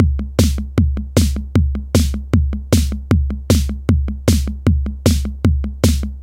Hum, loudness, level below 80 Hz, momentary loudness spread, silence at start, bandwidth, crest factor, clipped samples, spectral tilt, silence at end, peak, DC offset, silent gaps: none; -18 LUFS; -20 dBFS; 1 LU; 0 s; 16.5 kHz; 16 dB; under 0.1%; -6 dB/octave; 0 s; 0 dBFS; under 0.1%; none